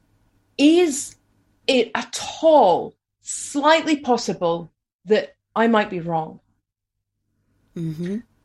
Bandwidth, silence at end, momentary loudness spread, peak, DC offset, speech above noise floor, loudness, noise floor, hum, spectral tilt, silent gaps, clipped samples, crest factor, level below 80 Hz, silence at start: 12.5 kHz; 0.25 s; 16 LU; -2 dBFS; under 0.1%; 61 dB; -20 LUFS; -81 dBFS; none; -4 dB/octave; 4.93-4.99 s; under 0.1%; 18 dB; -64 dBFS; 0.6 s